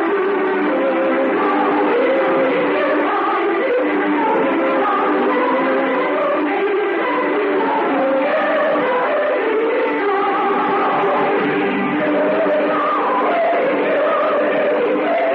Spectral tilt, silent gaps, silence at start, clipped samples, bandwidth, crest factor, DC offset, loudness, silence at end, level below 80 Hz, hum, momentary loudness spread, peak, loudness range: -8 dB/octave; none; 0 s; under 0.1%; 5.4 kHz; 10 dB; under 0.1%; -17 LUFS; 0 s; -66 dBFS; none; 2 LU; -6 dBFS; 1 LU